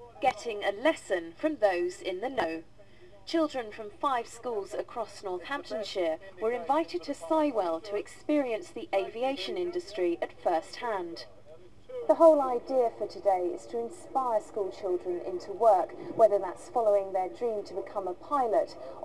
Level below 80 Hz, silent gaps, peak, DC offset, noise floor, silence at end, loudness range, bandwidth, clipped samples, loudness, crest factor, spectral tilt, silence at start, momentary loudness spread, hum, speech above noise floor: -66 dBFS; none; -8 dBFS; 0.3%; -55 dBFS; 0 s; 6 LU; 12 kHz; under 0.1%; -30 LUFS; 22 dB; -4.5 dB/octave; 0 s; 12 LU; none; 26 dB